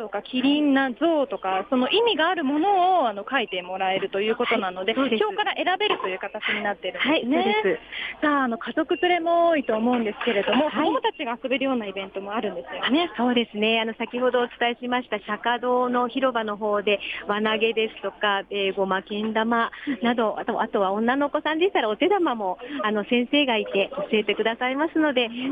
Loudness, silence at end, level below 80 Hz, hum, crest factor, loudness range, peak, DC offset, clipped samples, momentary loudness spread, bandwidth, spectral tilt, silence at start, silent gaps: -23 LUFS; 0 s; -64 dBFS; none; 14 dB; 2 LU; -8 dBFS; under 0.1%; under 0.1%; 6 LU; 5 kHz; -6.5 dB/octave; 0 s; none